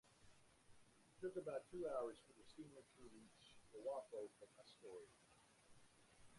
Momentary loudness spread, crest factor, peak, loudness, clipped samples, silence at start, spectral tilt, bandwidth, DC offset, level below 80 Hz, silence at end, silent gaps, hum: 17 LU; 20 dB; -36 dBFS; -53 LUFS; under 0.1%; 0.05 s; -5 dB/octave; 11.5 kHz; under 0.1%; -82 dBFS; 0 s; none; none